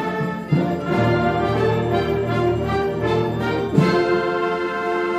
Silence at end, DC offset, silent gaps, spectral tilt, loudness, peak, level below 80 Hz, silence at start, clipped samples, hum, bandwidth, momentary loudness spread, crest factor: 0 s; under 0.1%; none; -7.5 dB/octave; -20 LUFS; -4 dBFS; -40 dBFS; 0 s; under 0.1%; none; 15 kHz; 4 LU; 16 dB